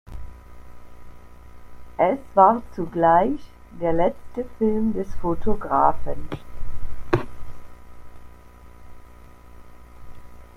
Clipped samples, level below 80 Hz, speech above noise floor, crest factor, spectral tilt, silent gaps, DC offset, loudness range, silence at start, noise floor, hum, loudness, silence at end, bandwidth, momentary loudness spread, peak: under 0.1%; -38 dBFS; 24 dB; 20 dB; -8.5 dB/octave; none; under 0.1%; 13 LU; 0.05 s; -44 dBFS; 60 Hz at -55 dBFS; -22 LUFS; 0.15 s; 6.4 kHz; 23 LU; -2 dBFS